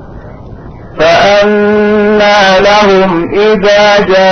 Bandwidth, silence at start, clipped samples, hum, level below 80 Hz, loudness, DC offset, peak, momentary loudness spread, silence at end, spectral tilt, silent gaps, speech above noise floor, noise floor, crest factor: 6.6 kHz; 0 s; 0.1%; none; -32 dBFS; -6 LUFS; under 0.1%; 0 dBFS; 4 LU; 0 s; -4.5 dB/octave; none; 21 dB; -27 dBFS; 6 dB